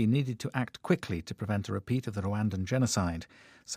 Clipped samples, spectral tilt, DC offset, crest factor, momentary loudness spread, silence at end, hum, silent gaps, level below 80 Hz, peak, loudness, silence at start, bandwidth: under 0.1%; -6 dB/octave; under 0.1%; 18 dB; 8 LU; 0 s; none; none; -60 dBFS; -14 dBFS; -32 LUFS; 0 s; 15.5 kHz